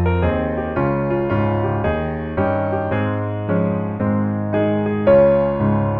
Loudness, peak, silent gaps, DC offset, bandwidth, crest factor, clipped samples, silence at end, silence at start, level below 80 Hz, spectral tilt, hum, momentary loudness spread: -19 LUFS; -2 dBFS; none; under 0.1%; 4.6 kHz; 16 dB; under 0.1%; 0 s; 0 s; -36 dBFS; -11.5 dB/octave; none; 7 LU